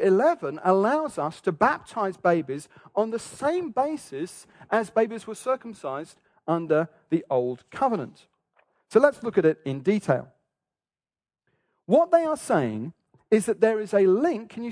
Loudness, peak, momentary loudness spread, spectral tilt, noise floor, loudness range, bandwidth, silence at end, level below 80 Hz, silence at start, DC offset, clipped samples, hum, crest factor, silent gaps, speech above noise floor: -25 LUFS; -4 dBFS; 13 LU; -6.5 dB/octave; under -90 dBFS; 4 LU; 11 kHz; 0 s; -68 dBFS; 0 s; under 0.1%; under 0.1%; none; 20 dB; none; over 66 dB